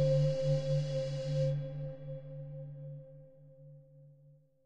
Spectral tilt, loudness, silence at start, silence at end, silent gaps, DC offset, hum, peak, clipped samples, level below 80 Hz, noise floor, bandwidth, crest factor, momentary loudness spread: -8 dB/octave; -35 LUFS; 0 s; 0 s; none; under 0.1%; none; -20 dBFS; under 0.1%; -62 dBFS; -63 dBFS; 8.2 kHz; 16 dB; 25 LU